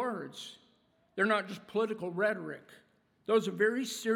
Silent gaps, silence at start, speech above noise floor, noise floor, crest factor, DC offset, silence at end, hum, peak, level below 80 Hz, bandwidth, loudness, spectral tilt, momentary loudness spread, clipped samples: none; 0 s; 38 dB; -70 dBFS; 18 dB; under 0.1%; 0 s; none; -14 dBFS; -84 dBFS; 16.5 kHz; -32 LUFS; -4.5 dB/octave; 16 LU; under 0.1%